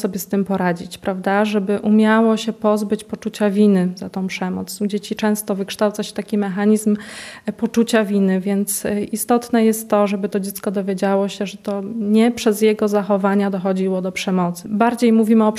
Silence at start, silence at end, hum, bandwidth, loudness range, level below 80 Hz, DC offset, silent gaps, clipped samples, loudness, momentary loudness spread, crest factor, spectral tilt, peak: 0 s; 0 s; none; 15 kHz; 3 LU; -60 dBFS; under 0.1%; none; under 0.1%; -19 LUFS; 9 LU; 16 dB; -5.5 dB/octave; -2 dBFS